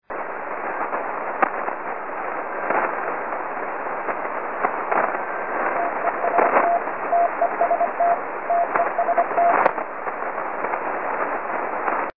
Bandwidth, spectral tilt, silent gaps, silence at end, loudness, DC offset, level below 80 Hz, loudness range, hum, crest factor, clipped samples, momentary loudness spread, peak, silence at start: 3.8 kHz; -9 dB/octave; none; 0 s; -23 LUFS; 1%; -70 dBFS; 5 LU; none; 22 dB; under 0.1%; 9 LU; -2 dBFS; 0 s